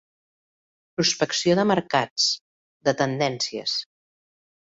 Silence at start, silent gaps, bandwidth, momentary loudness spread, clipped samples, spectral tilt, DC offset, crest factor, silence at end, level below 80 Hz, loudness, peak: 1 s; 2.11-2.16 s, 2.41-2.80 s; 8 kHz; 7 LU; under 0.1%; -3.5 dB/octave; under 0.1%; 20 dB; 0.85 s; -64 dBFS; -23 LUFS; -6 dBFS